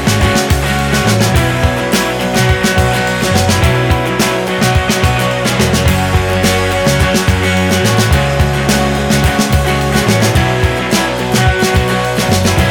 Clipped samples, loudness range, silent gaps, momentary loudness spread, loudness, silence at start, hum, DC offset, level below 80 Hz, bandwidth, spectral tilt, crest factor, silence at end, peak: under 0.1%; 1 LU; none; 2 LU; -12 LUFS; 0 s; none; under 0.1%; -22 dBFS; 19.5 kHz; -4.5 dB/octave; 12 dB; 0 s; 0 dBFS